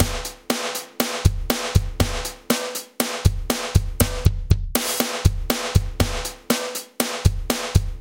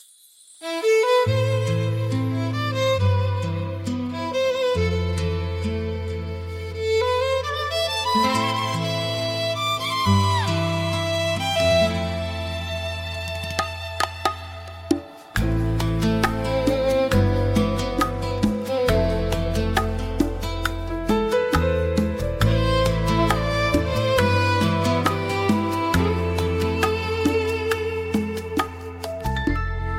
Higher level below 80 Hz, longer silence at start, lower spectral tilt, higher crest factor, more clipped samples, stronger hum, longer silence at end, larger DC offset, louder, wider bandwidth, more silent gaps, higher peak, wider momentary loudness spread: first, -28 dBFS vs -34 dBFS; second, 0 s vs 0.6 s; about the same, -4.5 dB/octave vs -5.5 dB/octave; about the same, 22 dB vs 18 dB; neither; neither; about the same, 0 s vs 0 s; neither; about the same, -23 LUFS vs -23 LUFS; about the same, 17 kHz vs 16.5 kHz; neither; first, 0 dBFS vs -4 dBFS; second, 4 LU vs 8 LU